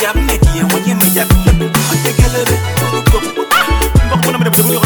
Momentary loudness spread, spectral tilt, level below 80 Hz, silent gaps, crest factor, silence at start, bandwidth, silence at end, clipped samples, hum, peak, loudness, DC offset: 3 LU; -4.5 dB/octave; -16 dBFS; none; 12 dB; 0 s; 19.5 kHz; 0 s; under 0.1%; none; 0 dBFS; -12 LUFS; under 0.1%